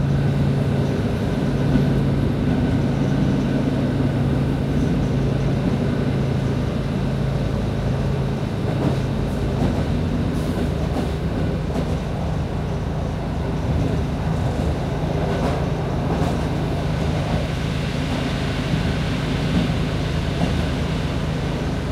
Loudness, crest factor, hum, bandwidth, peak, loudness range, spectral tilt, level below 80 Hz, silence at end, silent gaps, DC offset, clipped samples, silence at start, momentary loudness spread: -22 LUFS; 16 dB; none; 13 kHz; -4 dBFS; 3 LU; -7.5 dB/octave; -30 dBFS; 0 s; none; under 0.1%; under 0.1%; 0 s; 4 LU